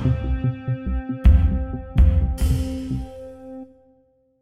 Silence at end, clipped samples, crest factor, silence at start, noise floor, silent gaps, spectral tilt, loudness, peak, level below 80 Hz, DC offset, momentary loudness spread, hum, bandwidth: 0.75 s; under 0.1%; 16 dB; 0 s; -60 dBFS; none; -8 dB/octave; -22 LUFS; -4 dBFS; -22 dBFS; under 0.1%; 20 LU; none; 12 kHz